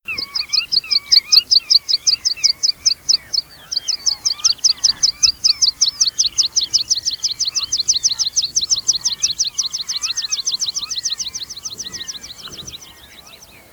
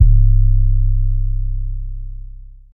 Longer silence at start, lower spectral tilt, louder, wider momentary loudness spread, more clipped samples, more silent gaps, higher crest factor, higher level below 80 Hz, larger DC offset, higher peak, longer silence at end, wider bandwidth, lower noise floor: about the same, 0.1 s vs 0 s; second, 3 dB/octave vs -15.5 dB/octave; first, -15 LUFS vs -18 LUFS; second, 14 LU vs 20 LU; neither; neither; about the same, 18 dB vs 14 dB; second, -54 dBFS vs -14 dBFS; neither; about the same, -2 dBFS vs 0 dBFS; first, 0.6 s vs 0.05 s; first, over 20 kHz vs 0.3 kHz; first, -42 dBFS vs -34 dBFS